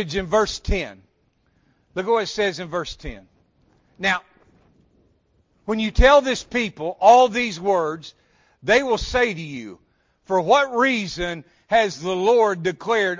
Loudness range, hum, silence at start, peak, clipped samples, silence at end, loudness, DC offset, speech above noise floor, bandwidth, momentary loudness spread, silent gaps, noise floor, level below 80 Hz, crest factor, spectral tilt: 9 LU; none; 0 s; -2 dBFS; under 0.1%; 0 s; -20 LUFS; under 0.1%; 45 dB; 7.6 kHz; 18 LU; none; -65 dBFS; -36 dBFS; 18 dB; -4.5 dB/octave